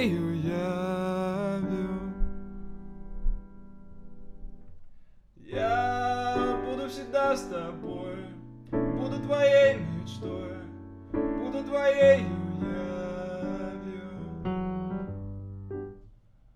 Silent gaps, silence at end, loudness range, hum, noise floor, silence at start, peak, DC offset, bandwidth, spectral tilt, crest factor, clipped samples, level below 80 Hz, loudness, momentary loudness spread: none; 0.4 s; 9 LU; none; -55 dBFS; 0 s; -8 dBFS; under 0.1%; 12 kHz; -7 dB/octave; 20 dB; under 0.1%; -42 dBFS; -29 LUFS; 19 LU